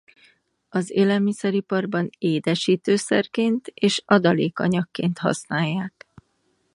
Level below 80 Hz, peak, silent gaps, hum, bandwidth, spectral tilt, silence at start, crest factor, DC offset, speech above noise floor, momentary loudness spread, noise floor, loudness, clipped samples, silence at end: -66 dBFS; 0 dBFS; none; none; 11.5 kHz; -5.5 dB/octave; 0.75 s; 22 dB; under 0.1%; 47 dB; 7 LU; -68 dBFS; -22 LUFS; under 0.1%; 0.85 s